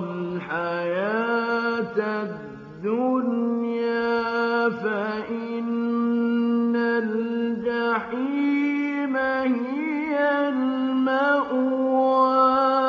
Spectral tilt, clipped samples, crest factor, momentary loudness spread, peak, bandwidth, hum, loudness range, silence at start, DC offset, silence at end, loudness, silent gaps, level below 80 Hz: -7.5 dB/octave; under 0.1%; 14 dB; 7 LU; -8 dBFS; 6.4 kHz; none; 3 LU; 0 s; under 0.1%; 0 s; -23 LUFS; none; -66 dBFS